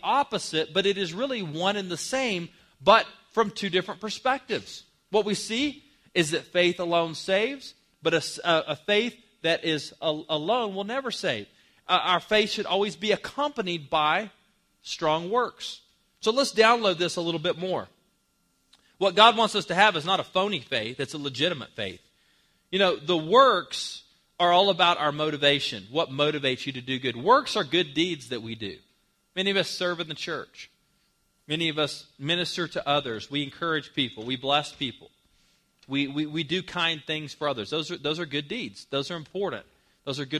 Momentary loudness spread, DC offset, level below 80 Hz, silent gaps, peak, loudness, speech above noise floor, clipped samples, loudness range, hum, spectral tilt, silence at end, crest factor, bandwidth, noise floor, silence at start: 13 LU; under 0.1%; -66 dBFS; none; 0 dBFS; -26 LUFS; 44 dB; under 0.1%; 6 LU; none; -4 dB/octave; 0 s; 26 dB; 14.5 kHz; -70 dBFS; 0.05 s